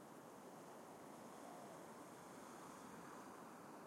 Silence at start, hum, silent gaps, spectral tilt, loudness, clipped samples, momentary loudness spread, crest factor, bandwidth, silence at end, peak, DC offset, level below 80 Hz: 0 s; none; none; -4.5 dB/octave; -58 LUFS; under 0.1%; 2 LU; 14 dB; 16 kHz; 0 s; -44 dBFS; under 0.1%; under -90 dBFS